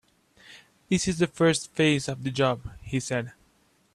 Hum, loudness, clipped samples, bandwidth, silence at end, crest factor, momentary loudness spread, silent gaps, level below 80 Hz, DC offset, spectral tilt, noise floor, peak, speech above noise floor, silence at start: none; -26 LUFS; under 0.1%; 13 kHz; 0.65 s; 18 dB; 9 LU; none; -54 dBFS; under 0.1%; -5 dB/octave; -65 dBFS; -10 dBFS; 39 dB; 0.5 s